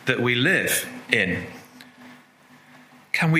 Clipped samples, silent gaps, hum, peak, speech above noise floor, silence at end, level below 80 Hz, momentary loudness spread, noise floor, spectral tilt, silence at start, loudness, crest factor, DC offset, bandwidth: under 0.1%; none; none; 0 dBFS; 30 dB; 0 s; -66 dBFS; 14 LU; -52 dBFS; -4 dB/octave; 0 s; -22 LUFS; 24 dB; under 0.1%; 16 kHz